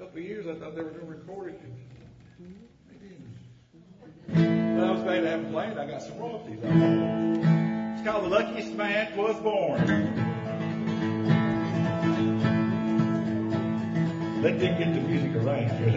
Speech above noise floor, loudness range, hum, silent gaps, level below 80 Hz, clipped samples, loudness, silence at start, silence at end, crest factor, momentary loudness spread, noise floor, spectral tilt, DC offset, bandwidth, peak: 26 dB; 15 LU; none; none; -60 dBFS; under 0.1%; -27 LUFS; 0 s; 0 s; 18 dB; 15 LU; -53 dBFS; -8 dB/octave; under 0.1%; 7.6 kHz; -8 dBFS